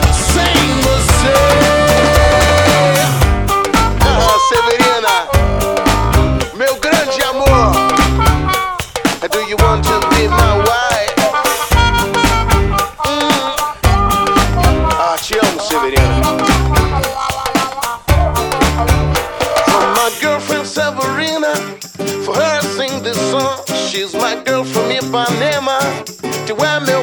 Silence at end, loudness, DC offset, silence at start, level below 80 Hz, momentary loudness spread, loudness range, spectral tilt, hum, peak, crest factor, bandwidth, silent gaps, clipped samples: 0 s; -13 LUFS; under 0.1%; 0 s; -20 dBFS; 7 LU; 6 LU; -4.5 dB/octave; none; 0 dBFS; 12 dB; 19.5 kHz; none; under 0.1%